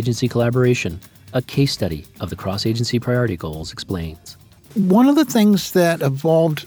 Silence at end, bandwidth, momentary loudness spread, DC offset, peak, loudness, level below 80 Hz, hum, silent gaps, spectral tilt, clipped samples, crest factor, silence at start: 0 s; over 20 kHz; 14 LU; under 0.1%; -4 dBFS; -19 LUFS; -44 dBFS; none; none; -6 dB/octave; under 0.1%; 14 dB; 0 s